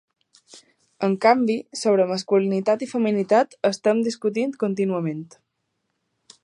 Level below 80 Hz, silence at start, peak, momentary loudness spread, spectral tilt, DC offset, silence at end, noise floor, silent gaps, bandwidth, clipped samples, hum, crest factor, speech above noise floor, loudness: -76 dBFS; 0.55 s; -2 dBFS; 7 LU; -6 dB/octave; under 0.1%; 1.2 s; -76 dBFS; none; 11 kHz; under 0.1%; none; 20 dB; 55 dB; -22 LUFS